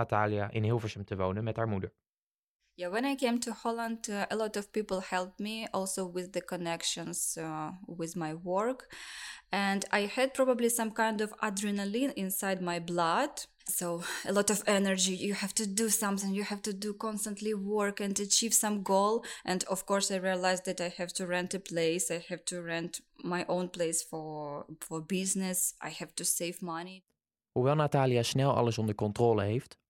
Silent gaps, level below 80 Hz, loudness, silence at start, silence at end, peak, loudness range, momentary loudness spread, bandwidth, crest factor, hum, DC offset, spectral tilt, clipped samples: 2.18-2.59 s; -68 dBFS; -32 LUFS; 0 s; 0.2 s; -10 dBFS; 5 LU; 10 LU; 16.5 kHz; 22 dB; none; under 0.1%; -4 dB/octave; under 0.1%